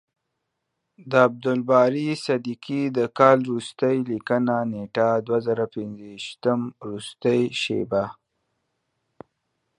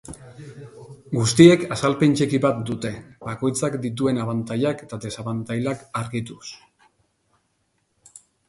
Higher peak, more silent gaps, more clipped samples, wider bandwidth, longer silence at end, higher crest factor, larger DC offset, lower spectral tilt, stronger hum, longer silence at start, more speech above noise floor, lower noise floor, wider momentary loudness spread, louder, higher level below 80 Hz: about the same, -2 dBFS vs 0 dBFS; neither; neither; about the same, 11 kHz vs 11.5 kHz; second, 1.65 s vs 1.95 s; about the same, 22 dB vs 22 dB; neither; about the same, -6 dB/octave vs -5.5 dB/octave; neither; first, 1 s vs 0.1 s; first, 56 dB vs 49 dB; first, -79 dBFS vs -70 dBFS; second, 13 LU vs 26 LU; about the same, -23 LUFS vs -21 LUFS; second, -66 dBFS vs -56 dBFS